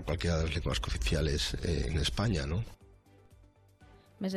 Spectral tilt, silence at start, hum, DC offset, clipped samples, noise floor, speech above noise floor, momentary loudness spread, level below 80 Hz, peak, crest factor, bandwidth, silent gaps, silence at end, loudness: -5 dB/octave; 0 s; none; under 0.1%; under 0.1%; -60 dBFS; 29 dB; 6 LU; -40 dBFS; -18 dBFS; 14 dB; 13.5 kHz; none; 0 s; -33 LUFS